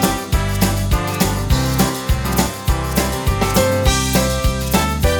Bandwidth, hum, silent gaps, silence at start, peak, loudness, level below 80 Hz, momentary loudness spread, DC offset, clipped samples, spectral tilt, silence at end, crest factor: over 20 kHz; none; none; 0 s; 0 dBFS; -17 LUFS; -22 dBFS; 4 LU; under 0.1%; under 0.1%; -4.5 dB/octave; 0 s; 16 dB